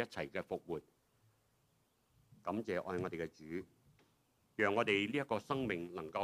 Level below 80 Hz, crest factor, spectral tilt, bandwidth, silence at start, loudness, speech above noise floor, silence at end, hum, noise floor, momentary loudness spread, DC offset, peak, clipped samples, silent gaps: -74 dBFS; 22 dB; -5.5 dB/octave; 15.5 kHz; 0 s; -39 LUFS; 37 dB; 0 s; none; -77 dBFS; 13 LU; under 0.1%; -20 dBFS; under 0.1%; none